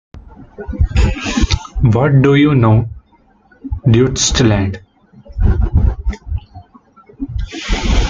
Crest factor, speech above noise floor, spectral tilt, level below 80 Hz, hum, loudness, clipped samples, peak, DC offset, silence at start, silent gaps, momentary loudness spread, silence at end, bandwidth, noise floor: 14 dB; 39 dB; -5.5 dB/octave; -20 dBFS; none; -14 LUFS; under 0.1%; -2 dBFS; under 0.1%; 0.15 s; none; 17 LU; 0 s; 9.2 kHz; -51 dBFS